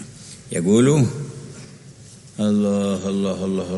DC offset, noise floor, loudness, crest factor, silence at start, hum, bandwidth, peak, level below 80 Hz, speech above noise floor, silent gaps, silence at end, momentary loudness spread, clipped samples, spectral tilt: under 0.1%; -43 dBFS; -20 LUFS; 16 dB; 0 s; none; 11.5 kHz; -6 dBFS; -56 dBFS; 24 dB; none; 0 s; 23 LU; under 0.1%; -6.5 dB/octave